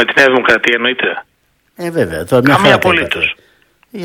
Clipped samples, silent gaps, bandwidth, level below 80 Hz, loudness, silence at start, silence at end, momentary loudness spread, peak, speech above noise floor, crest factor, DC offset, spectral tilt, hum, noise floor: 0.7%; none; 19.5 kHz; -44 dBFS; -11 LUFS; 0 s; 0 s; 16 LU; 0 dBFS; 45 dB; 14 dB; under 0.1%; -5 dB/octave; none; -57 dBFS